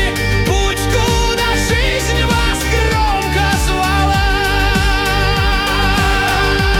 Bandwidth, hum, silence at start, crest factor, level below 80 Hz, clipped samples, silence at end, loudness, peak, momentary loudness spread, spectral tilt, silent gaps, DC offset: 18 kHz; none; 0 s; 12 dB; -18 dBFS; under 0.1%; 0 s; -14 LUFS; -2 dBFS; 2 LU; -4 dB/octave; none; under 0.1%